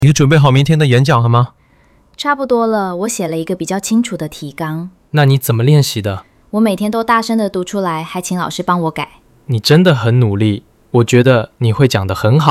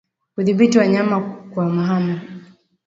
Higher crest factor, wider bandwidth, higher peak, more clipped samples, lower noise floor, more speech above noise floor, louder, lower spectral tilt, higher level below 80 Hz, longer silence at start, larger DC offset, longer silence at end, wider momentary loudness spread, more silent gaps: about the same, 12 dB vs 16 dB; first, 15.5 kHz vs 7.8 kHz; about the same, 0 dBFS vs -2 dBFS; neither; first, -50 dBFS vs -43 dBFS; first, 37 dB vs 27 dB; first, -14 LUFS vs -18 LUFS; about the same, -6 dB/octave vs -7 dB/octave; first, -46 dBFS vs -62 dBFS; second, 0 s vs 0.35 s; neither; second, 0 s vs 0.45 s; second, 12 LU vs 15 LU; neither